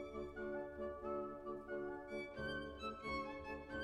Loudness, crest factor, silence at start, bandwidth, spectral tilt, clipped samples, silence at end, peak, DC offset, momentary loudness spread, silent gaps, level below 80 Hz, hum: -47 LUFS; 14 dB; 0 s; 11.5 kHz; -6 dB/octave; under 0.1%; 0 s; -34 dBFS; under 0.1%; 3 LU; none; -62 dBFS; none